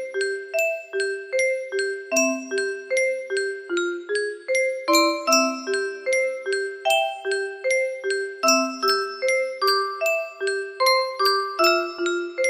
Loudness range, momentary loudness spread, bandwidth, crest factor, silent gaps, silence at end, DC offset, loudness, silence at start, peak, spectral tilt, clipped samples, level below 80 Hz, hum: 3 LU; 7 LU; 15.5 kHz; 18 dB; none; 0 s; under 0.1%; -23 LUFS; 0 s; -6 dBFS; 0.5 dB/octave; under 0.1%; -74 dBFS; none